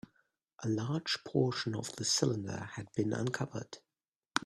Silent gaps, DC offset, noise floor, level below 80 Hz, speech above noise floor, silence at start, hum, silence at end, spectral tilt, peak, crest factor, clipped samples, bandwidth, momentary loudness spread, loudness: 4.16-4.22 s; under 0.1%; under -90 dBFS; -70 dBFS; over 55 dB; 0.6 s; none; 0 s; -4 dB/octave; -8 dBFS; 28 dB; under 0.1%; 13.5 kHz; 11 LU; -35 LUFS